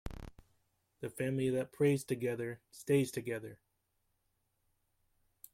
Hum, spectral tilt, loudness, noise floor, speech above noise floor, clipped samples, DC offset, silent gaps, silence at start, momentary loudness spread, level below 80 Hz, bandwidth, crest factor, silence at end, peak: none; -6.5 dB/octave; -36 LUFS; -80 dBFS; 45 dB; under 0.1%; under 0.1%; none; 0.05 s; 17 LU; -60 dBFS; 16.5 kHz; 20 dB; 2 s; -18 dBFS